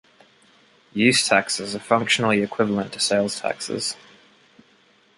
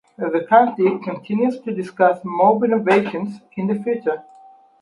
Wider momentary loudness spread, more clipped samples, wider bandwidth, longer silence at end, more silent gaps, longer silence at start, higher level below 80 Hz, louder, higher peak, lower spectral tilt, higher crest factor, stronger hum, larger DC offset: second, 9 LU vs 12 LU; neither; about the same, 11.5 kHz vs 11 kHz; first, 1.25 s vs 0.6 s; neither; first, 0.95 s vs 0.2 s; first, -62 dBFS vs -70 dBFS; about the same, -21 LUFS vs -19 LUFS; about the same, -2 dBFS vs 0 dBFS; second, -3 dB/octave vs -8 dB/octave; about the same, 22 dB vs 18 dB; neither; neither